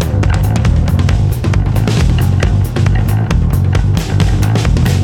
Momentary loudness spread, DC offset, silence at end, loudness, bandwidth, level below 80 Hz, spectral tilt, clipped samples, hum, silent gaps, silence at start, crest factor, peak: 1 LU; under 0.1%; 0 s; -13 LUFS; 17 kHz; -18 dBFS; -6.5 dB/octave; under 0.1%; none; none; 0 s; 10 dB; 0 dBFS